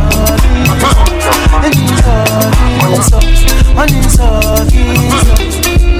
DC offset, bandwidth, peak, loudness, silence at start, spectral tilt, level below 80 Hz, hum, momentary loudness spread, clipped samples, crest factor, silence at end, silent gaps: under 0.1%; 16 kHz; 0 dBFS; -9 LUFS; 0 s; -5 dB/octave; -10 dBFS; none; 1 LU; under 0.1%; 6 dB; 0 s; none